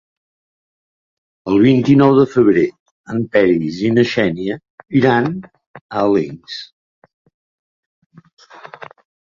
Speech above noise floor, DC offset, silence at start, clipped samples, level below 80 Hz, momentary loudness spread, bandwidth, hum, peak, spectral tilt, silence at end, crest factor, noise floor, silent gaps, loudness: 23 dB; under 0.1%; 1.45 s; under 0.1%; -52 dBFS; 19 LU; 7.2 kHz; none; -2 dBFS; -7.5 dB/octave; 2.75 s; 16 dB; -37 dBFS; 2.79-3.04 s, 4.70-4.78 s, 5.67-5.74 s, 5.81-5.89 s; -15 LUFS